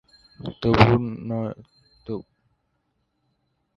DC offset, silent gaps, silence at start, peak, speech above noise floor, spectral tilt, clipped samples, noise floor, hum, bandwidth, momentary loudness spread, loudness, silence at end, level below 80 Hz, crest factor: under 0.1%; none; 0.4 s; 0 dBFS; 52 dB; -8 dB/octave; under 0.1%; -73 dBFS; none; 7.2 kHz; 20 LU; -21 LUFS; 1.55 s; -44 dBFS; 26 dB